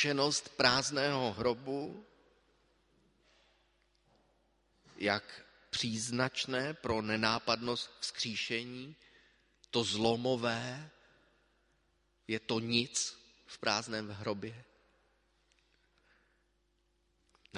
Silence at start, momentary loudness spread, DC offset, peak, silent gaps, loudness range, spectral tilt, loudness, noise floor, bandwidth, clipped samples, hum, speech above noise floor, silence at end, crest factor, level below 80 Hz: 0 s; 15 LU; under 0.1%; -10 dBFS; none; 9 LU; -3 dB/octave; -34 LUFS; -76 dBFS; 11.5 kHz; under 0.1%; none; 41 dB; 0 s; 28 dB; -66 dBFS